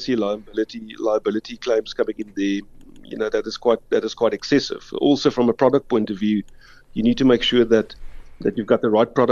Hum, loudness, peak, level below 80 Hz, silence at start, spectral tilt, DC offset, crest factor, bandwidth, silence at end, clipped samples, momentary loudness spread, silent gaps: none; -21 LUFS; -2 dBFS; -46 dBFS; 0 s; -5.5 dB/octave; under 0.1%; 18 dB; 7.4 kHz; 0 s; under 0.1%; 10 LU; none